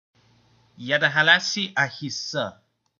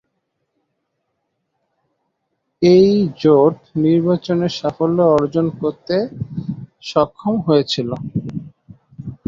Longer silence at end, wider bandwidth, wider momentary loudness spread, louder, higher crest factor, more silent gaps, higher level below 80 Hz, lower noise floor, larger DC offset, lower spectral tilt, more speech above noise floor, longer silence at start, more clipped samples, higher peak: first, 0.5 s vs 0.15 s; about the same, 7.4 kHz vs 7.4 kHz; about the same, 13 LU vs 14 LU; second, -21 LUFS vs -17 LUFS; first, 22 dB vs 16 dB; neither; second, -76 dBFS vs -52 dBFS; second, -60 dBFS vs -73 dBFS; neither; second, -2.5 dB/octave vs -7.5 dB/octave; second, 37 dB vs 57 dB; second, 0.8 s vs 2.6 s; neither; about the same, -2 dBFS vs -2 dBFS